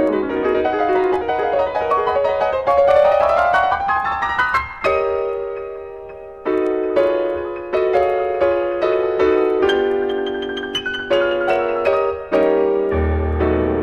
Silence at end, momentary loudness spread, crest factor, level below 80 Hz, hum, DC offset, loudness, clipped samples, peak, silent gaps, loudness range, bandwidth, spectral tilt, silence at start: 0 s; 8 LU; 14 dB; -36 dBFS; none; 0.2%; -18 LUFS; under 0.1%; -4 dBFS; none; 4 LU; 9 kHz; -6.5 dB/octave; 0 s